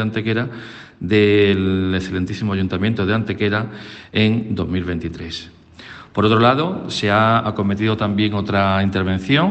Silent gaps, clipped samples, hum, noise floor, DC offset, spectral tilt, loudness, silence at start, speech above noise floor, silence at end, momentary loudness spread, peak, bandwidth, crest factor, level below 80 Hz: none; under 0.1%; none; -39 dBFS; under 0.1%; -7 dB/octave; -18 LUFS; 0 s; 21 dB; 0 s; 15 LU; -2 dBFS; 8.6 kHz; 16 dB; -50 dBFS